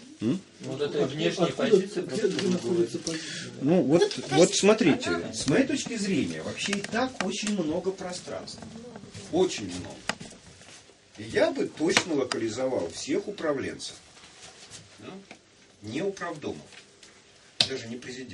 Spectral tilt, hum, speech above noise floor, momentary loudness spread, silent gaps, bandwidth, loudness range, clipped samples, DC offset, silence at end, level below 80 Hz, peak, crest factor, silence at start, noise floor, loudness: -4.5 dB/octave; none; 28 dB; 21 LU; none; 11.5 kHz; 11 LU; under 0.1%; under 0.1%; 0 s; -64 dBFS; -2 dBFS; 26 dB; 0 s; -55 dBFS; -27 LUFS